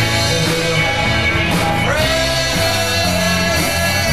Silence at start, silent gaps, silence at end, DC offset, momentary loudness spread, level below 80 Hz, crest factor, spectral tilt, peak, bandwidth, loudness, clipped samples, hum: 0 s; none; 0 s; 2%; 1 LU; -30 dBFS; 12 dB; -3.5 dB/octave; -4 dBFS; 15.5 kHz; -15 LUFS; under 0.1%; none